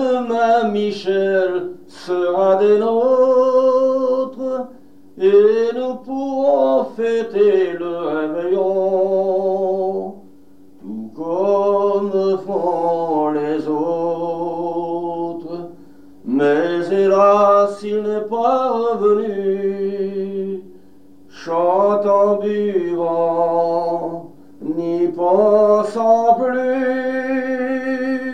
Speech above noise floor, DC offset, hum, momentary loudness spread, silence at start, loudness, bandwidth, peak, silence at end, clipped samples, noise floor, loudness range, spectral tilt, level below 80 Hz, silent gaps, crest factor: 32 dB; 0.7%; none; 11 LU; 0 s; -17 LUFS; 9.2 kHz; -2 dBFS; 0 s; under 0.1%; -47 dBFS; 4 LU; -7 dB/octave; -66 dBFS; none; 14 dB